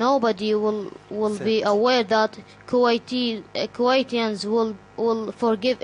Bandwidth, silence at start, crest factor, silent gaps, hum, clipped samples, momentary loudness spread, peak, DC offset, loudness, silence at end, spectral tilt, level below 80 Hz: 10.5 kHz; 0 s; 16 dB; none; none; under 0.1%; 8 LU; -6 dBFS; under 0.1%; -23 LUFS; 0.05 s; -5 dB/octave; -64 dBFS